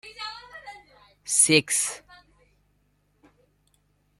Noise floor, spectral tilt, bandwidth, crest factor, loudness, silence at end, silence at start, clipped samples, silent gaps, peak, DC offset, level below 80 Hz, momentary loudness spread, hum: -68 dBFS; -1.5 dB/octave; 14.5 kHz; 26 dB; -22 LUFS; 2.2 s; 0.05 s; under 0.1%; none; -4 dBFS; under 0.1%; -66 dBFS; 25 LU; 50 Hz at -60 dBFS